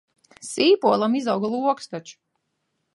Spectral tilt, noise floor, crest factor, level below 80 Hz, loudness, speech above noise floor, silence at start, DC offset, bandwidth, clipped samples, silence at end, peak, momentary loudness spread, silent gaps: -4.5 dB/octave; -75 dBFS; 18 dB; -74 dBFS; -21 LUFS; 54 dB; 0.4 s; under 0.1%; 11.5 kHz; under 0.1%; 0.8 s; -6 dBFS; 18 LU; none